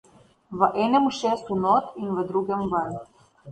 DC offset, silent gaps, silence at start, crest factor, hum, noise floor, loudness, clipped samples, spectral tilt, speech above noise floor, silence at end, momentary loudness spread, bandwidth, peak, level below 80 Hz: under 0.1%; none; 0.5 s; 18 dB; none; -46 dBFS; -24 LUFS; under 0.1%; -6.5 dB/octave; 22 dB; 0 s; 10 LU; 10.5 kHz; -6 dBFS; -58 dBFS